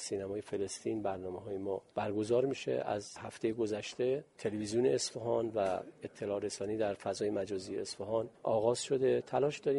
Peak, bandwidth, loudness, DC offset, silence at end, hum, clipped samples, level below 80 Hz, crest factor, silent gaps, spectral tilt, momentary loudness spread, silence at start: -18 dBFS; 11.5 kHz; -35 LUFS; under 0.1%; 0 s; none; under 0.1%; -70 dBFS; 18 dB; none; -5 dB/octave; 8 LU; 0 s